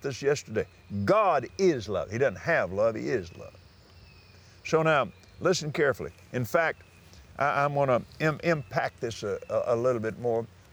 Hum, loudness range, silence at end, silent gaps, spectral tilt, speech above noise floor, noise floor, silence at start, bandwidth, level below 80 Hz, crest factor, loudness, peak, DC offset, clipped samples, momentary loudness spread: none; 2 LU; 0.25 s; none; -5.5 dB/octave; 26 dB; -54 dBFS; 0 s; over 20 kHz; -62 dBFS; 20 dB; -28 LUFS; -10 dBFS; under 0.1%; under 0.1%; 10 LU